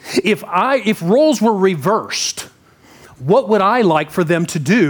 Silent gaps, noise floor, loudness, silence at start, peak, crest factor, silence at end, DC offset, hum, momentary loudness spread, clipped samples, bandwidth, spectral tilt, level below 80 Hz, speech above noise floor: none; -47 dBFS; -15 LUFS; 0.05 s; -2 dBFS; 12 dB; 0 s; under 0.1%; none; 6 LU; under 0.1%; over 20 kHz; -5 dB/octave; -60 dBFS; 32 dB